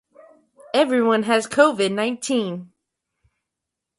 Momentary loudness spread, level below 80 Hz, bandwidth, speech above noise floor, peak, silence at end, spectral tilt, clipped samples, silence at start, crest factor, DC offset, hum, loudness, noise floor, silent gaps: 7 LU; -68 dBFS; 11.5 kHz; 64 dB; -2 dBFS; 1.35 s; -4 dB/octave; under 0.1%; 0.75 s; 20 dB; under 0.1%; none; -20 LUFS; -84 dBFS; none